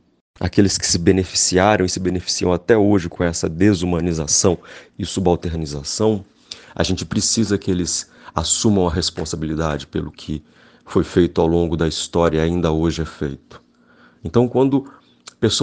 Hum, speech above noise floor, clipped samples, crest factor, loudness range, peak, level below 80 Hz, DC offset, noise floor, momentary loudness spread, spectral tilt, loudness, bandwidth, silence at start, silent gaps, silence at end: none; 33 dB; under 0.1%; 20 dB; 4 LU; 0 dBFS; -38 dBFS; under 0.1%; -52 dBFS; 11 LU; -4.5 dB/octave; -19 LUFS; 10.5 kHz; 0.4 s; none; 0 s